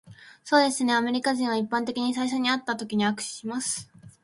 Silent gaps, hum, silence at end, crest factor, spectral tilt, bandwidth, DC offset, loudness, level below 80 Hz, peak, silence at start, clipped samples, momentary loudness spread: none; none; 0.15 s; 20 dB; -3 dB/octave; 11.5 kHz; under 0.1%; -26 LUFS; -70 dBFS; -6 dBFS; 0.05 s; under 0.1%; 9 LU